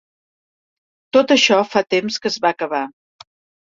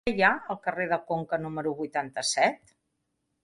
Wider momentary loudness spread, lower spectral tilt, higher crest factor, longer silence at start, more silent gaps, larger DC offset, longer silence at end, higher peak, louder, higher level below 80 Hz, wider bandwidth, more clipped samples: about the same, 10 LU vs 8 LU; about the same, -3 dB/octave vs -3.5 dB/octave; about the same, 18 dB vs 22 dB; first, 1.15 s vs 0.05 s; neither; neither; about the same, 0.75 s vs 0.85 s; first, 0 dBFS vs -8 dBFS; first, -17 LUFS vs -28 LUFS; about the same, -64 dBFS vs -60 dBFS; second, 7.8 kHz vs 11.5 kHz; neither